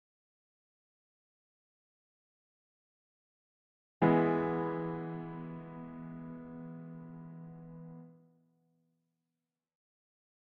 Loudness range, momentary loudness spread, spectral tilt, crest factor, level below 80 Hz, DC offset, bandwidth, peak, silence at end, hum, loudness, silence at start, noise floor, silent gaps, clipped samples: 18 LU; 21 LU; -7.5 dB/octave; 26 dB; -70 dBFS; under 0.1%; 4.5 kHz; -14 dBFS; 2.25 s; none; -35 LUFS; 4 s; under -90 dBFS; none; under 0.1%